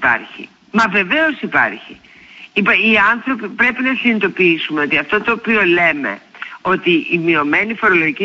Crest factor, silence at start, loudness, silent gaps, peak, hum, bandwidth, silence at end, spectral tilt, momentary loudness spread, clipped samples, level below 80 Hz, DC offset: 14 dB; 0 s; -14 LUFS; none; -2 dBFS; none; 8 kHz; 0 s; -5.5 dB/octave; 10 LU; under 0.1%; -52 dBFS; under 0.1%